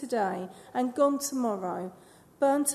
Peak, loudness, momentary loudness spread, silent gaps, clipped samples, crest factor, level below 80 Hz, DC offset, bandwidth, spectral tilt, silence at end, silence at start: -12 dBFS; -29 LUFS; 11 LU; none; under 0.1%; 16 dB; -76 dBFS; under 0.1%; 13.5 kHz; -4 dB/octave; 0 s; 0 s